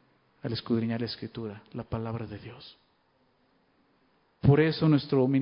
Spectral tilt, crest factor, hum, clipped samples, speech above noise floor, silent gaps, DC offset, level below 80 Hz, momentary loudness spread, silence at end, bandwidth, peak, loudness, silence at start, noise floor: -11.5 dB/octave; 22 dB; none; under 0.1%; 41 dB; none; under 0.1%; -54 dBFS; 19 LU; 0 s; 5.4 kHz; -8 dBFS; -28 LUFS; 0.45 s; -69 dBFS